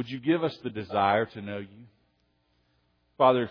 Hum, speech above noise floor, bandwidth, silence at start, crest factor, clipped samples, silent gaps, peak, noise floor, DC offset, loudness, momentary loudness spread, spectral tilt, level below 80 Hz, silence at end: none; 44 dB; 5.4 kHz; 0 s; 22 dB; under 0.1%; none; -8 dBFS; -71 dBFS; under 0.1%; -27 LUFS; 15 LU; -8 dB/octave; -70 dBFS; 0 s